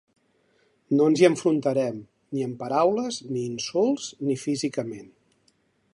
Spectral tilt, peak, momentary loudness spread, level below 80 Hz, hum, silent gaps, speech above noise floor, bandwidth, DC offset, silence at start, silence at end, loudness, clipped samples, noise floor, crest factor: -5.5 dB/octave; -6 dBFS; 13 LU; -70 dBFS; none; none; 43 dB; 11.5 kHz; under 0.1%; 0.9 s; 0.85 s; -25 LUFS; under 0.1%; -67 dBFS; 20 dB